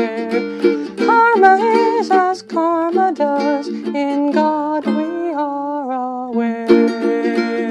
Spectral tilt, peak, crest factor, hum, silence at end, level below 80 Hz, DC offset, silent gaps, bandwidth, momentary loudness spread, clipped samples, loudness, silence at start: -6 dB/octave; 0 dBFS; 16 dB; none; 0 s; -62 dBFS; under 0.1%; none; 10.5 kHz; 10 LU; under 0.1%; -16 LUFS; 0 s